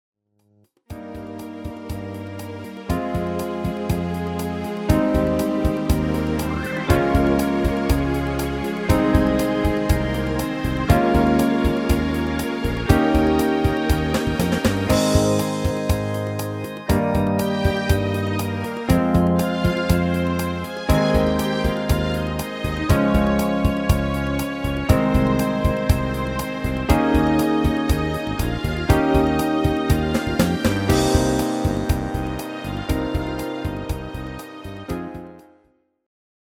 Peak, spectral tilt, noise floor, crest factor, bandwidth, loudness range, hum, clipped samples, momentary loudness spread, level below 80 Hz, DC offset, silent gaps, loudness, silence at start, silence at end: 0 dBFS; -6.5 dB/octave; -61 dBFS; 20 dB; 19.5 kHz; 7 LU; none; under 0.1%; 11 LU; -30 dBFS; under 0.1%; none; -21 LUFS; 0.9 s; 1.05 s